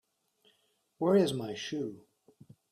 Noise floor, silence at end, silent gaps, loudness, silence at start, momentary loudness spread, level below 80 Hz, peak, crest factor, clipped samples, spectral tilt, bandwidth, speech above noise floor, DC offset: -73 dBFS; 0.75 s; none; -31 LUFS; 1 s; 11 LU; -74 dBFS; -16 dBFS; 20 dB; under 0.1%; -6 dB/octave; 15 kHz; 43 dB; under 0.1%